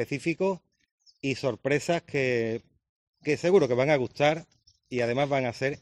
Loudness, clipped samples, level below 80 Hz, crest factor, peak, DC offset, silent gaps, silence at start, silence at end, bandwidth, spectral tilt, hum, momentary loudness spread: -27 LUFS; under 0.1%; -64 dBFS; 18 dB; -10 dBFS; under 0.1%; 0.91-0.98 s, 2.89-3.13 s; 0 s; 0.05 s; 12.5 kHz; -6 dB/octave; none; 12 LU